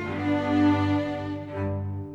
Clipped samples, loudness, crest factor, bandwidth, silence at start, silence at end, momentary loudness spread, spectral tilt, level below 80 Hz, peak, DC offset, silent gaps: under 0.1%; -26 LUFS; 14 dB; 7.2 kHz; 0 s; 0 s; 10 LU; -8 dB/octave; -56 dBFS; -12 dBFS; under 0.1%; none